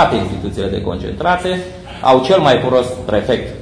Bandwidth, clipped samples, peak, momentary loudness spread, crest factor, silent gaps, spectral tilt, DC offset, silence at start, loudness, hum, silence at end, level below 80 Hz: 10.5 kHz; under 0.1%; 0 dBFS; 10 LU; 14 dB; none; -6 dB/octave; under 0.1%; 0 s; -15 LUFS; none; 0 s; -36 dBFS